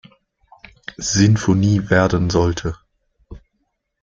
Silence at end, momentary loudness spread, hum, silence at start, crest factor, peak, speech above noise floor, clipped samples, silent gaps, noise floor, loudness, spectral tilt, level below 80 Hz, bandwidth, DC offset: 0.65 s; 20 LU; none; 1 s; 18 dB; -2 dBFS; 55 dB; under 0.1%; none; -71 dBFS; -17 LUFS; -5.5 dB/octave; -40 dBFS; 7.6 kHz; under 0.1%